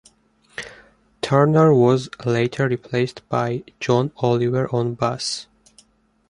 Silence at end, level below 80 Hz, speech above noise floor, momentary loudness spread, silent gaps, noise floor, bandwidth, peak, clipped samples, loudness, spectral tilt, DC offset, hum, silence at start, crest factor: 0.85 s; -56 dBFS; 39 dB; 17 LU; none; -58 dBFS; 11 kHz; -2 dBFS; under 0.1%; -20 LUFS; -6.5 dB/octave; under 0.1%; none; 0.6 s; 18 dB